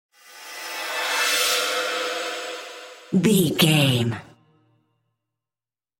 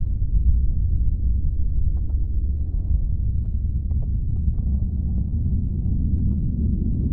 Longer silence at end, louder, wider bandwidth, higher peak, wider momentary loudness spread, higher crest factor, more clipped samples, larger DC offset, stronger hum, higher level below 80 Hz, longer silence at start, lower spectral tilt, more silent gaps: first, 1.75 s vs 0 s; first, -21 LUFS vs -25 LUFS; first, 17 kHz vs 0.9 kHz; about the same, -4 dBFS vs -6 dBFS; first, 18 LU vs 3 LU; first, 20 dB vs 14 dB; neither; neither; neither; second, -64 dBFS vs -22 dBFS; first, 0.3 s vs 0 s; second, -4 dB/octave vs -15.5 dB/octave; neither